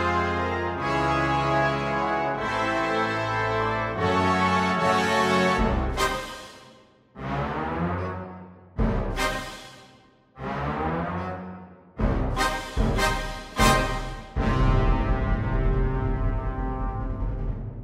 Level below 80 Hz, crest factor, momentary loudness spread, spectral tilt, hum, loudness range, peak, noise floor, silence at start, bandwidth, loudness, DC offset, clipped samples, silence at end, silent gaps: -32 dBFS; 20 dB; 12 LU; -5.5 dB/octave; none; 7 LU; -6 dBFS; -55 dBFS; 0 s; 15.5 kHz; -25 LUFS; under 0.1%; under 0.1%; 0 s; none